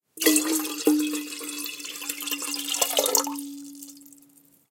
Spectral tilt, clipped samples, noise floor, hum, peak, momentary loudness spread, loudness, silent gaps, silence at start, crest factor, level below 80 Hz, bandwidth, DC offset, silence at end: 0 dB/octave; under 0.1%; -57 dBFS; none; -2 dBFS; 18 LU; -25 LUFS; none; 0.15 s; 26 dB; -80 dBFS; 17 kHz; under 0.1%; 0.6 s